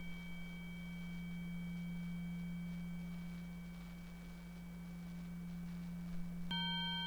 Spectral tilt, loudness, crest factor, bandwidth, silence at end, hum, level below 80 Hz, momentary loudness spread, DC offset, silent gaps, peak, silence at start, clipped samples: -5.5 dB/octave; -46 LUFS; 14 dB; over 20 kHz; 0 s; none; -58 dBFS; 10 LU; under 0.1%; none; -30 dBFS; 0 s; under 0.1%